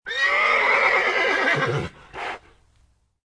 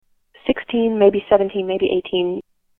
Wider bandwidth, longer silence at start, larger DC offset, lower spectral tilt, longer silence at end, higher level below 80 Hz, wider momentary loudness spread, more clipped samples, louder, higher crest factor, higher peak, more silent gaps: first, 10.5 kHz vs 3.9 kHz; second, 0.05 s vs 0.45 s; neither; second, -4 dB/octave vs -9 dB/octave; first, 0.9 s vs 0.4 s; about the same, -54 dBFS vs -52 dBFS; first, 16 LU vs 9 LU; neither; about the same, -19 LUFS vs -19 LUFS; about the same, 18 dB vs 18 dB; second, -6 dBFS vs 0 dBFS; neither